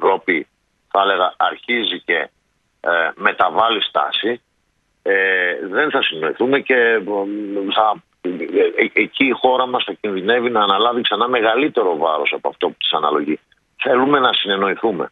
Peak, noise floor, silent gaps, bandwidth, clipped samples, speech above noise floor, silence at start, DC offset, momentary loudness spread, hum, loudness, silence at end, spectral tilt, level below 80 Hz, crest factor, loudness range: 0 dBFS; -65 dBFS; none; 4.7 kHz; under 0.1%; 48 dB; 0 s; under 0.1%; 8 LU; none; -17 LUFS; 0.05 s; -6.5 dB/octave; -66 dBFS; 18 dB; 2 LU